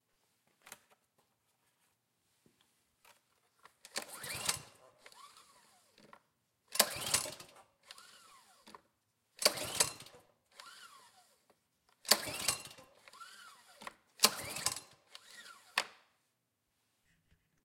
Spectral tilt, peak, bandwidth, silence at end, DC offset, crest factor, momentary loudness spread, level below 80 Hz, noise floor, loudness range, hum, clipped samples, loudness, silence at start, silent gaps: 0 dB/octave; -6 dBFS; 16.5 kHz; 1.7 s; under 0.1%; 38 dB; 26 LU; -76 dBFS; -83 dBFS; 9 LU; none; under 0.1%; -34 LUFS; 0.65 s; none